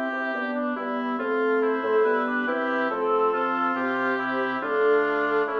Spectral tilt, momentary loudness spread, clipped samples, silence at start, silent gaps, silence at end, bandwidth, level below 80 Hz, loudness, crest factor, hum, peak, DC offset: -6 dB/octave; 5 LU; under 0.1%; 0 s; none; 0 s; 5.8 kHz; -74 dBFS; -24 LUFS; 12 dB; none; -12 dBFS; under 0.1%